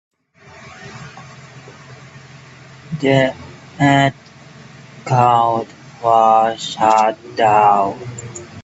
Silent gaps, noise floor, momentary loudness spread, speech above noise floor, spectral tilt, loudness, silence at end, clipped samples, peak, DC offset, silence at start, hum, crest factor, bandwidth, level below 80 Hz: none; -44 dBFS; 23 LU; 30 dB; -5.5 dB/octave; -15 LUFS; 0 s; under 0.1%; 0 dBFS; under 0.1%; 0.6 s; none; 18 dB; 8.2 kHz; -58 dBFS